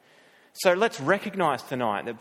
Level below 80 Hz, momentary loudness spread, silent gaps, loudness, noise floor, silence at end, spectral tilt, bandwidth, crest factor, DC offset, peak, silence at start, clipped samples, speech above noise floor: -72 dBFS; 6 LU; none; -25 LUFS; -57 dBFS; 0 s; -4.5 dB/octave; 16.5 kHz; 22 dB; under 0.1%; -4 dBFS; 0.55 s; under 0.1%; 32 dB